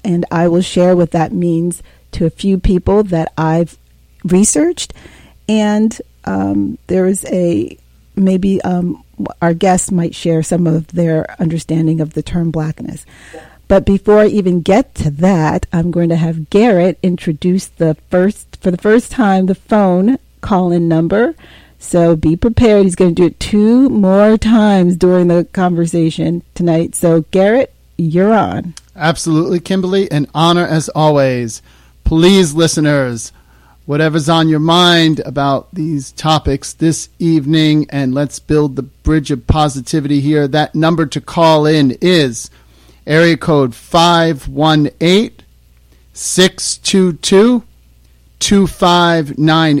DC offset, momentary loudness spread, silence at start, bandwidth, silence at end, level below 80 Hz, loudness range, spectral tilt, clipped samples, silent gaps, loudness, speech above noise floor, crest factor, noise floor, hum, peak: under 0.1%; 9 LU; 0.05 s; 15.5 kHz; 0 s; -32 dBFS; 4 LU; -5.5 dB/octave; under 0.1%; none; -13 LUFS; 34 dB; 12 dB; -46 dBFS; none; 0 dBFS